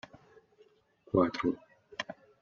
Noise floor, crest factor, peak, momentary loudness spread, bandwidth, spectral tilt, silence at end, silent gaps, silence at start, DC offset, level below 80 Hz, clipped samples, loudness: -65 dBFS; 22 dB; -14 dBFS; 16 LU; 7.4 kHz; -5 dB/octave; 0.3 s; none; 0.15 s; under 0.1%; -66 dBFS; under 0.1%; -33 LUFS